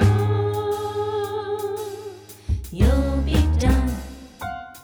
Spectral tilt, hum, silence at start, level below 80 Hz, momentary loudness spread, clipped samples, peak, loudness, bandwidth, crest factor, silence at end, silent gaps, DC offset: -7 dB/octave; none; 0 s; -26 dBFS; 15 LU; under 0.1%; -6 dBFS; -23 LUFS; over 20 kHz; 16 dB; 0 s; none; under 0.1%